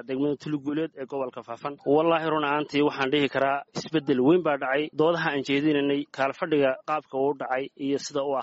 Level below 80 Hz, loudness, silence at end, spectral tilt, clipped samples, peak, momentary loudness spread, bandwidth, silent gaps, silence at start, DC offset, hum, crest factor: -68 dBFS; -26 LUFS; 0 s; -4 dB/octave; under 0.1%; -10 dBFS; 9 LU; 8 kHz; none; 0.1 s; under 0.1%; none; 16 dB